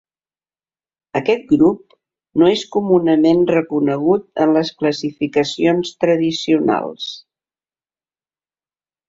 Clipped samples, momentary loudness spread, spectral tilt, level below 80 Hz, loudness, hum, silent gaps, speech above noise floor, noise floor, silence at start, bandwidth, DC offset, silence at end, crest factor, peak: under 0.1%; 10 LU; -6 dB/octave; -58 dBFS; -16 LUFS; none; none; over 74 dB; under -90 dBFS; 1.15 s; 7.8 kHz; under 0.1%; 1.9 s; 16 dB; -2 dBFS